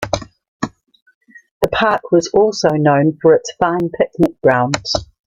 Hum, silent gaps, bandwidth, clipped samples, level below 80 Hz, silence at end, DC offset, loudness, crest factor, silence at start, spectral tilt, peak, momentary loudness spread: none; 0.48-0.60 s, 1.02-1.06 s, 1.15-1.21 s, 1.51-1.61 s; 15.5 kHz; under 0.1%; -44 dBFS; 0.25 s; under 0.1%; -15 LUFS; 16 dB; 0 s; -5.5 dB/octave; 0 dBFS; 11 LU